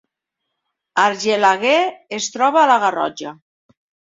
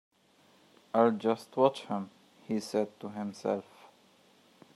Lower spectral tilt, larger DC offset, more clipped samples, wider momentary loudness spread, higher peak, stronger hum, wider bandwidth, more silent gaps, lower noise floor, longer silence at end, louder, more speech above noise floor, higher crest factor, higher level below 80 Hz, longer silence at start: second, -2.5 dB/octave vs -6 dB/octave; neither; neither; about the same, 11 LU vs 11 LU; first, -2 dBFS vs -10 dBFS; neither; second, 7.8 kHz vs 13 kHz; neither; first, -79 dBFS vs -65 dBFS; second, 0.8 s vs 1.15 s; first, -17 LUFS vs -32 LUFS; first, 62 dB vs 34 dB; second, 18 dB vs 24 dB; first, -70 dBFS vs -86 dBFS; about the same, 0.95 s vs 0.95 s